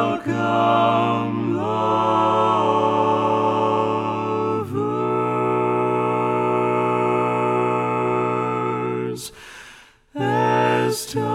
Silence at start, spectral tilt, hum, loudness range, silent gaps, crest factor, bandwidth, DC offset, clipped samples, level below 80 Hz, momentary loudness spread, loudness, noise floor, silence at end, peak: 0 s; -6 dB/octave; none; 4 LU; none; 14 dB; 16 kHz; under 0.1%; under 0.1%; -60 dBFS; 6 LU; -20 LUFS; -47 dBFS; 0 s; -6 dBFS